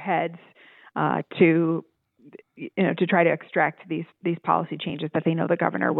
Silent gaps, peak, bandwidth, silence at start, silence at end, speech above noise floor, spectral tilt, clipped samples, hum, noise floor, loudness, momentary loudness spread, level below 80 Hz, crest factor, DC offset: none; -4 dBFS; 4.1 kHz; 0 s; 0 s; 26 dB; -10.5 dB/octave; under 0.1%; none; -50 dBFS; -24 LUFS; 12 LU; -74 dBFS; 20 dB; under 0.1%